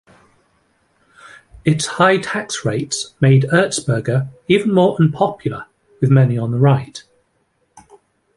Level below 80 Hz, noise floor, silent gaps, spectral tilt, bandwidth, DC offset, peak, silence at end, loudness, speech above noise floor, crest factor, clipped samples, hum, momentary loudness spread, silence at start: -52 dBFS; -64 dBFS; none; -6 dB/octave; 11.5 kHz; under 0.1%; 0 dBFS; 1.35 s; -16 LUFS; 49 dB; 16 dB; under 0.1%; none; 9 LU; 1.65 s